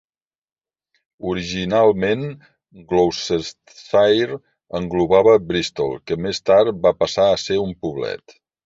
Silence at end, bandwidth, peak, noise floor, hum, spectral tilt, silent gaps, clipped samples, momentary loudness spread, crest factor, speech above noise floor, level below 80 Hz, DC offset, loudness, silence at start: 0.5 s; 7.8 kHz; -2 dBFS; -71 dBFS; none; -5 dB/octave; none; under 0.1%; 13 LU; 18 dB; 52 dB; -48 dBFS; under 0.1%; -19 LUFS; 1.2 s